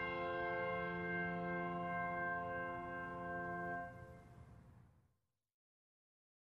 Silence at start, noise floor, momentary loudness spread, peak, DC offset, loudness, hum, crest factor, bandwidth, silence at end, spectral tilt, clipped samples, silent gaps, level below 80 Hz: 0 s; -83 dBFS; 18 LU; -30 dBFS; under 0.1%; -43 LUFS; none; 14 dB; 6.6 kHz; 1.65 s; -8 dB/octave; under 0.1%; none; -68 dBFS